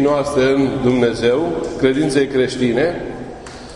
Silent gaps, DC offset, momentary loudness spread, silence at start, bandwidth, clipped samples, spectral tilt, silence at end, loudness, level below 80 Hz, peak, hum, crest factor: none; under 0.1%; 13 LU; 0 s; 11 kHz; under 0.1%; -6 dB/octave; 0 s; -17 LUFS; -42 dBFS; -2 dBFS; none; 14 dB